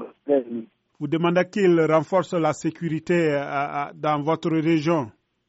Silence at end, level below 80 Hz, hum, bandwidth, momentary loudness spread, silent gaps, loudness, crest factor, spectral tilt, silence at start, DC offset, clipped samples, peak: 0.4 s; -66 dBFS; none; 8 kHz; 9 LU; none; -23 LUFS; 16 dB; -6 dB/octave; 0 s; under 0.1%; under 0.1%; -6 dBFS